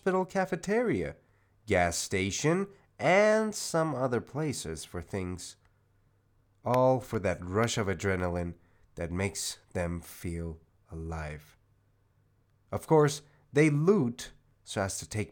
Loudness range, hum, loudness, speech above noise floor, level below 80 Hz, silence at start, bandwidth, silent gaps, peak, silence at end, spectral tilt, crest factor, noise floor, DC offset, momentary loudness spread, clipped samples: 9 LU; none; -30 LUFS; 39 dB; -58 dBFS; 0.05 s; 19 kHz; none; -12 dBFS; 0 s; -5 dB/octave; 20 dB; -68 dBFS; under 0.1%; 15 LU; under 0.1%